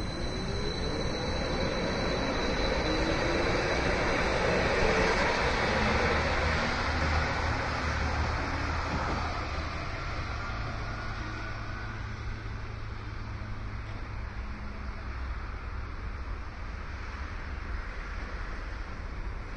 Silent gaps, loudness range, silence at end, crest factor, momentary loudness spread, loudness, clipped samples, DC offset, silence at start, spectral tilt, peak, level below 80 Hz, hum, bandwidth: none; 12 LU; 0 s; 16 dB; 13 LU; -32 LUFS; under 0.1%; under 0.1%; 0 s; -5 dB/octave; -14 dBFS; -38 dBFS; none; 10.5 kHz